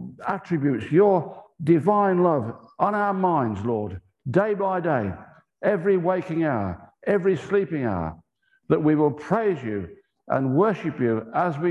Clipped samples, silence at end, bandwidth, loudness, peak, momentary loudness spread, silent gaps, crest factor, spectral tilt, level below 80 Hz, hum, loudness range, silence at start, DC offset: under 0.1%; 0 s; 8.2 kHz; -23 LUFS; -6 dBFS; 12 LU; none; 18 dB; -9 dB/octave; -52 dBFS; none; 3 LU; 0 s; under 0.1%